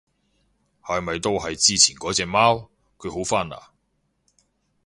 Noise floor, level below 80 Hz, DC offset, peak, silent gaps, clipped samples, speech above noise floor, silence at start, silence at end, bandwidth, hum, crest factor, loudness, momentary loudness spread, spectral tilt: -71 dBFS; -50 dBFS; under 0.1%; 0 dBFS; none; under 0.1%; 49 dB; 0.85 s; 1.25 s; 11.5 kHz; none; 24 dB; -20 LUFS; 18 LU; -2 dB/octave